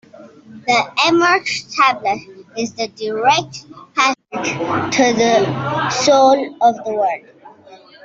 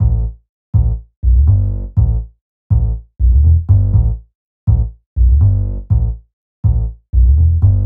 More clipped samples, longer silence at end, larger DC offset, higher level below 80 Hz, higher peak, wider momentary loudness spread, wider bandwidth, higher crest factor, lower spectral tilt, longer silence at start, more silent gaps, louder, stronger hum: neither; first, 0.3 s vs 0 s; neither; second, -58 dBFS vs -16 dBFS; about the same, -2 dBFS vs 0 dBFS; first, 13 LU vs 10 LU; first, 8 kHz vs 1.4 kHz; about the same, 16 dB vs 12 dB; second, -3.5 dB/octave vs -15 dB/octave; first, 0.2 s vs 0 s; second, none vs 0.49-0.73 s, 1.16-1.22 s, 2.41-2.70 s, 4.35-4.67 s, 5.06-5.16 s, 6.33-6.63 s; about the same, -16 LUFS vs -15 LUFS; neither